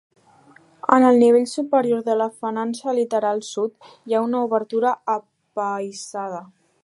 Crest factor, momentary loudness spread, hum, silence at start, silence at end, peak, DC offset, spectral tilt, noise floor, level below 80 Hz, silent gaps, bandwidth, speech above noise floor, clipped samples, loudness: 20 dB; 15 LU; none; 0.9 s; 0.4 s; -2 dBFS; under 0.1%; -5 dB/octave; -52 dBFS; -76 dBFS; none; 11.5 kHz; 32 dB; under 0.1%; -21 LUFS